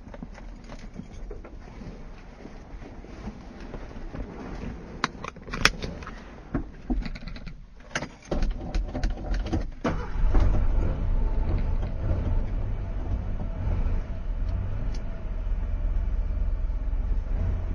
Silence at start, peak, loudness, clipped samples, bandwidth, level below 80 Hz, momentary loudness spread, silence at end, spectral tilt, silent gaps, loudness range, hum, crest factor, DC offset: 0 s; 0 dBFS; -32 LUFS; under 0.1%; 8.8 kHz; -28 dBFS; 15 LU; 0 s; -5.5 dB/octave; none; 13 LU; none; 28 dB; under 0.1%